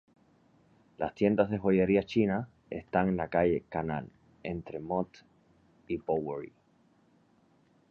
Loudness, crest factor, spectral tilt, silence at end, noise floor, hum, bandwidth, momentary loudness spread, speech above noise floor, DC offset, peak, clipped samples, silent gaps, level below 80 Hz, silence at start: -31 LUFS; 22 dB; -9 dB/octave; 1.4 s; -66 dBFS; none; 6.8 kHz; 14 LU; 37 dB; under 0.1%; -12 dBFS; under 0.1%; none; -58 dBFS; 1 s